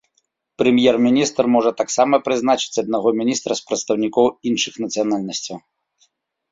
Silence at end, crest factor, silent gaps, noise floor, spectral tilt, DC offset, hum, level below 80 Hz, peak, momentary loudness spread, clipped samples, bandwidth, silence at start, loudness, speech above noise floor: 0.95 s; 18 dB; none; -68 dBFS; -4 dB/octave; under 0.1%; none; -60 dBFS; -2 dBFS; 8 LU; under 0.1%; 7.8 kHz; 0.6 s; -18 LUFS; 50 dB